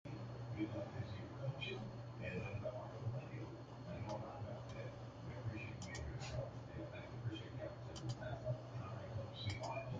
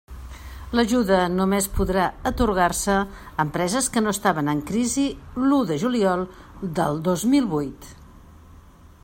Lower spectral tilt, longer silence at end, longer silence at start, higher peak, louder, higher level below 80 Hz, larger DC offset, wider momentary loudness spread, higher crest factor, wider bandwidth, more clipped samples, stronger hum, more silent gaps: first, -6.5 dB/octave vs -5 dB/octave; second, 0 s vs 0.5 s; about the same, 0.05 s vs 0.1 s; second, -30 dBFS vs -4 dBFS; second, -48 LUFS vs -22 LUFS; second, -62 dBFS vs -40 dBFS; neither; second, 5 LU vs 11 LU; about the same, 16 dB vs 18 dB; second, 8.8 kHz vs 16.5 kHz; neither; neither; neither